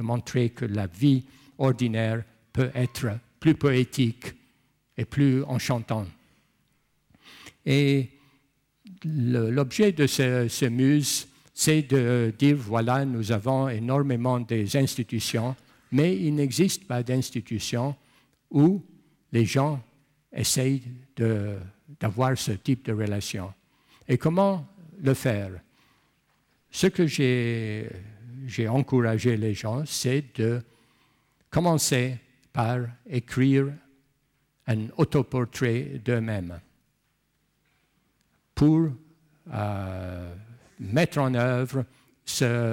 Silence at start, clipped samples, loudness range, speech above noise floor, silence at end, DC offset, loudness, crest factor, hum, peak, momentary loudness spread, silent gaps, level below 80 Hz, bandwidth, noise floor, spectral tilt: 0 s; under 0.1%; 5 LU; 47 dB; 0 s; under 0.1%; -26 LUFS; 16 dB; none; -10 dBFS; 15 LU; none; -58 dBFS; 16.5 kHz; -72 dBFS; -6 dB/octave